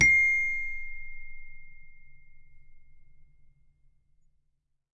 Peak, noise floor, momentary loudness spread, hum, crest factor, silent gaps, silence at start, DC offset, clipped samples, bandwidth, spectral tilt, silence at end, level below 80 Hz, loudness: -10 dBFS; -74 dBFS; 27 LU; none; 22 dB; none; 0 s; under 0.1%; under 0.1%; 10.5 kHz; -2 dB/octave; 1.7 s; -48 dBFS; -24 LUFS